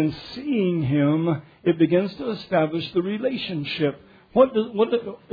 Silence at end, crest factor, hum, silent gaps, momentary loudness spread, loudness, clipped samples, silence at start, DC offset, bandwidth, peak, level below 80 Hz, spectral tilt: 0.15 s; 18 dB; none; none; 8 LU; -23 LUFS; under 0.1%; 0 s; under 0.1%; 5 kHz; -4 dBFS; -58 dBFS; -9 dB/octave